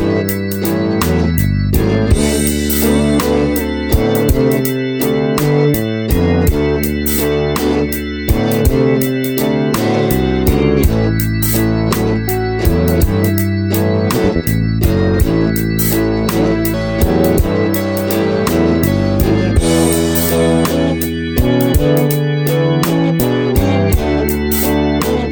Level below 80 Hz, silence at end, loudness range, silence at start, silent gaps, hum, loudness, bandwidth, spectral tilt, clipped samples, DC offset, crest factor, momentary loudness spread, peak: -22 dBFS; 0 s; 1 LU; 0 s; none; none; -14 LUFS; over 20 kHz; -6 dB/octave; under 0.1%; under 0.1%; 14 dB; 3 LU; 0 dBFS